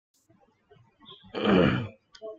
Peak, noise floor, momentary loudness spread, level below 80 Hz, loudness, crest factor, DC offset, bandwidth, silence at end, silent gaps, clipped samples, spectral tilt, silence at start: -10 dBFS; -65 dBFS; 19 LU; -56 dBFS; -25 LUFS; 20 dB; under 0.1%; 7.2 kHz; 0.05 s; none; under 0.1%; -8 dB/octave; 1.1 s